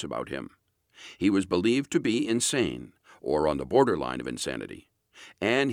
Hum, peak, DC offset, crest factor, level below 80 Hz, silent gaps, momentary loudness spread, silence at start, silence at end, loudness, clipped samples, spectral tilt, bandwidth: none; -8 dBFS; under 0.1%; 20 dB; -56 dBFS; none; 18 LU; 0 s; 0 s; -27 LUFS; under 0.1%; -4.5 dB/octave; 16 kHz